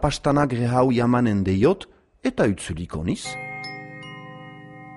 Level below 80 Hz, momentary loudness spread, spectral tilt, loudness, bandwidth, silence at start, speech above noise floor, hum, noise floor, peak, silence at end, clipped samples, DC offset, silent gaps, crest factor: -42 dBFS; 20 LU; -6.5 dB/octave; -23 LUFS; 11.5 kHz; 0 s; 20 dB; none; -41 dBFS; -6 dBFS; 0 s; under 0.1%; under 0.1%; none; 18 dB